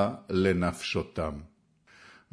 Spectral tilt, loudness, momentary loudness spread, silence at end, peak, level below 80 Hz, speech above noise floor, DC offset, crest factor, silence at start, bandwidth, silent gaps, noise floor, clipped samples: -6 dB/octave; -29 LUFS; 10 LU; 0.2 s; -12 dBFS; -50 dBFS; 32 dB; under 0.1%; 18 dB; 0 s; 11 kHz; none; -61 dBFS; under 0.1%